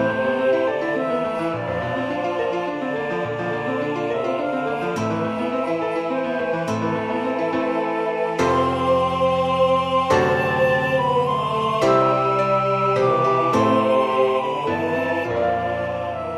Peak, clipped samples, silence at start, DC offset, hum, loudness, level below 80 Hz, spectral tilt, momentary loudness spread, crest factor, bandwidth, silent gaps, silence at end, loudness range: -4 dBFS; under 0.1%; 0 s; under 0.1%; none; -21 LUFS; -54 dBFS; -6.5 dB/octave; 6 LU; 16 dB; 12.5 kHz; none; 0 s; 5 LU